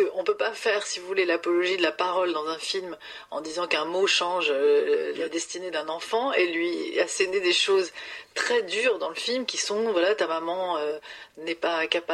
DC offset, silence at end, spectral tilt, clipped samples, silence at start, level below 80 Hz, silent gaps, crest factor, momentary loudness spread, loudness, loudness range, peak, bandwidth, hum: under 0.1%; 0 s; -1.5 dB/octave; under 0.1%; 0 s; -72 dBFS; none; 20 dB; 10 LU; -25 LUFS; 2 LU; -6 dBFS; 12.5 kHz; none